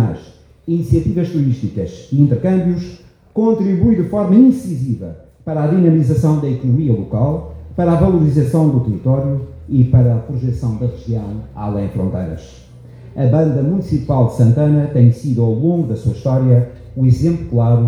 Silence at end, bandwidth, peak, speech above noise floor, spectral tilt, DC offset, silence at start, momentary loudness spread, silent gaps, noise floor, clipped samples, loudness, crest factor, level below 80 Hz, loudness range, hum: 0 s; 9.4 kHz; 0 dBFS; 27 dB; -10 dB/octave; under 0.1%; 0 s; 12 LU; none; -41 dBFS; under 0.1%; -15 LUFS; 14 dB; -36 dBFS; 4 LU; none